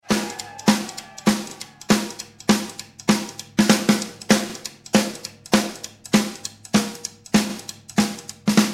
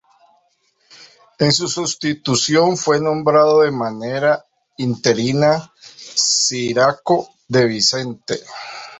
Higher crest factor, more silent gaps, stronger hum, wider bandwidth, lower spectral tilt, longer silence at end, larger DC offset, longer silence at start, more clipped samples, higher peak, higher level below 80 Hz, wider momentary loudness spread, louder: first, 22 dB vs 16 dB; neither; neither; first, 16 kHz vs 8.4 kHz; about the same, -4 dB/octave vs -3.5 dB/octave; about the same, 0 s vs 0 s; neither; second, 0.1 s vs 1 s; neither; about the same, 0 dBFS vs -2 dBFS; about the same, -54 dBFS vs -58 dBFS; first, 14 LU vs 11 LU; second, -22 LUFS vs -17 LUFS